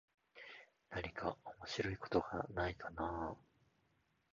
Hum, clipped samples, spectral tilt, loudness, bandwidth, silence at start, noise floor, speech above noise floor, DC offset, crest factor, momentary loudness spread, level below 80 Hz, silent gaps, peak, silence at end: none; under 0.1%; -4 dB/octave; -43 LUFS; 7.2 kHz; 0.35 s; -79 dBFS; 37 dB; under 0.1%; 24 dB; 17 LU; -60 dBFS; none; -22 dBFS; 0.95 s